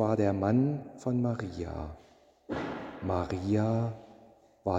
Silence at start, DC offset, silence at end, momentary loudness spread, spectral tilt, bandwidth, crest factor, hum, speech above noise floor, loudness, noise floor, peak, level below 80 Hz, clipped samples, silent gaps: 0 s; under 0.1%; 0 s; 12 LU; -8.5 dB/octave; 8.2 kHz; 18 dB; none; 29 dB; -32 LUFS; -58 dBFS; -14 dBFS; -54 dBFS; under 0.1%; none